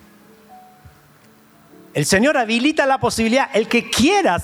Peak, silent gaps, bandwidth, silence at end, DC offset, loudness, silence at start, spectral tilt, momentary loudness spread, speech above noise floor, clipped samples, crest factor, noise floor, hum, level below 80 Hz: -4 dBFS; none; over 20 kHz; 0 s; under 0.1%; -17 LUFS; 0.5 s; -4 dB/octave; 3 LU; 33 dB; under 0.1%; 16 dB; -50 dBFS; none; -48 dBFS